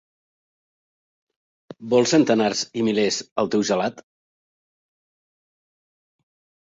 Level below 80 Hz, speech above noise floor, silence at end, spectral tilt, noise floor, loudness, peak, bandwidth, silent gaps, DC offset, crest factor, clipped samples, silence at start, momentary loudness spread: -66 dBFS; over 70 dB; 2.65 s; -4 dB/octave; under -90 dBFS; -21 LUFS; -4 dBFS; 8 kHz; 3.32-3.36 s; under 0.1%; 20 dB; under 0.1%; 1.8 s; 7 LU